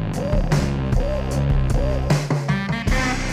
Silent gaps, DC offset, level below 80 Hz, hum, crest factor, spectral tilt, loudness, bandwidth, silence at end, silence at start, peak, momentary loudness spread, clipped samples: none; under 0.1%; -24 dBFS; none; 12 dB; -6 dB/octave; -22 LUFS; 14.5 kHz; 0 s; 0 s; -8 dBFS; 2 LU; under 0.1%